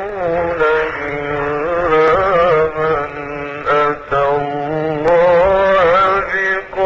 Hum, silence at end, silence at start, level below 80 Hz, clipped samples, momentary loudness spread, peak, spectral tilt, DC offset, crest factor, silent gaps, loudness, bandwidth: none; 0 s; 0 s; -38 dBFS; under 0.1%; 9 LU; -4 dBFS; -6.5 dB/octave; under 0.1%; 10 dB; none; -15 LUFS; 7.4 kHz